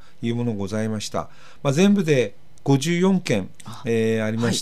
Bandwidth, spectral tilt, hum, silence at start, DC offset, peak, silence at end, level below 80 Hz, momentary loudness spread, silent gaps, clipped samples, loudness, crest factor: 14 kHz; -6 dB/octave; none; 0.2 s; 2%; -4 dBFS; 0 s; -58 dBFS; 12 LU; none; under 0.1%; -22 LUFS; 18 dB